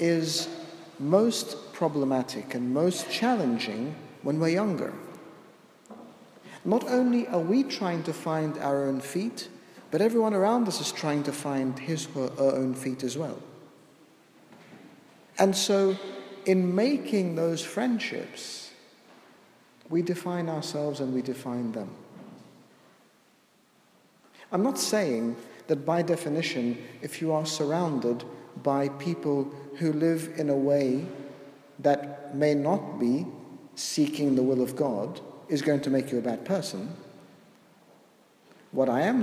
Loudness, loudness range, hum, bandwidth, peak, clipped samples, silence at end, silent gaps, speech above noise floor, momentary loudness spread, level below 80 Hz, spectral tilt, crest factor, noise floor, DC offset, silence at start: -28 LUFS; 5 LU; none; 15.5 kHz; -6 dBFS; under 0.1%; 0 s; none; 36 dB; 16 LU; -78 dBFS; -5.5 dB/octave; 22 dB; -63 dBFS; under 0.1%; 0 s